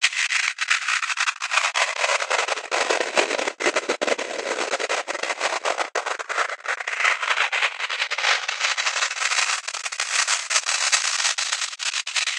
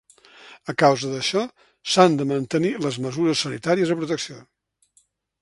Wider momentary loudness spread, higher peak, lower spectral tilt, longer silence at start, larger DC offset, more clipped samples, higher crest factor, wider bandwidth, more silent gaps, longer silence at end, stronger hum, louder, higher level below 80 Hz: second, 6 LU vs 13 LU; about the same, -2 dBFS vs 0 dBFS; second, 2.5 dB/octave vs -4.5 dB/octave; second, 0 s vs 0.45 s; neither; neither; about the same, 22 dB vs 22 dB; first, 15 kHz vs 11.5 kHz; neither; second, 0 s vs 1 s; neither; about the same, -22 LUFS vs -22 LUFS; second, -82 dBFS vs -64 dBFS